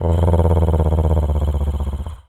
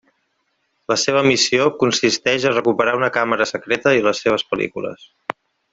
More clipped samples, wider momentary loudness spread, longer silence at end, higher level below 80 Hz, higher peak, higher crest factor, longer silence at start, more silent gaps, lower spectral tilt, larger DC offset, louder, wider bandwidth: neither; second, 7 LU vs 16 LU; second, 0.1 s vs 0.8 s; first, -22 dBFS vs -58 dBFS; about the same, -2 dBFS vs 0 dBFS; about the same, 14 dB vs 18 dB; second, 0 s vs 0.9 s; neither; first, -9 dB/octave vs -3.5 dB/octave; neither; about the same, -18 LUFS vs -17 LUFS; first, 11 kHz vs 8.2 kHz